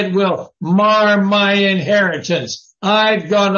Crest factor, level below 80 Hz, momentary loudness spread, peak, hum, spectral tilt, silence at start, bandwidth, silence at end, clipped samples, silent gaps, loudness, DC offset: 12 dB; -62 dBFS; 8 LU; -4 dBFS; none; -5 dB/octave; 0 s; 7.2 kHz; 0 s; under 0.1%; none; -14 LUFS; under 0.1%